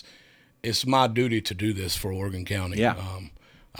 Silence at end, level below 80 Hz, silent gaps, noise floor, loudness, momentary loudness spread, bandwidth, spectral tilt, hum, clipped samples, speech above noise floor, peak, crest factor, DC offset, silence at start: 0 s; -50 dBFS; none; -57 dBFS; -26 LUFS; 14 LU; over 20 kHz; -5 dB/octave; none; under 0.1%; 31 dB; -6 dBFS; 20 dB; under 0.1%; 0.05 s